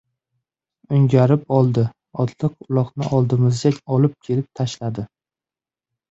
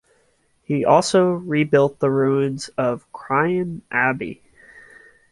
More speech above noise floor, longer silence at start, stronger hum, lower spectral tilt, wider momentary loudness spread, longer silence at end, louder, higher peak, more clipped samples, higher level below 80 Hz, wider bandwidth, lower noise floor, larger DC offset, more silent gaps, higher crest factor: first, over 72 dB vs 43 dB; first, 0.9 s vs 0.7 s; neither; first, -8 dB/octave vs -6 dB/octave; about the same, 10 LU vs 9 LU; about the same, 1.05 s vs 1 s; about the same, -20 LUFS vs -20 LUFS; about the same, -2 dBFS vs -2 dBFS; neither; first, -54 dBFS vs -60 dBFS; second, 7.8 kHz vs 11.5 kHz; first, under -90 dBFS vs -62 dBFS; neither; neither; about the same, 18 dB vs 18 dB